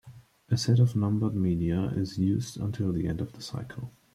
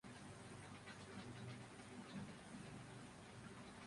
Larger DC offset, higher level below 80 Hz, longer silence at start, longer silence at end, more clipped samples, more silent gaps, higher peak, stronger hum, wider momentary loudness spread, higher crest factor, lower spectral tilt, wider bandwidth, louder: neither; first, -52 dBFS vs -74 dBFS; about the same, 0.05 s vs 0.05 s; first, 0.25 s vs 0 s; neither; neither; first, -12 dBFS vs -42 dBFS; neither; first, 14 LU vs 3 LU; about the same, 16 dB vs 14 dB; first, -7 dB/octave vs -5 dB/octave; first, 13 kHz vs 11.5 kHz; first, -28 LUFS vs -56 LUFS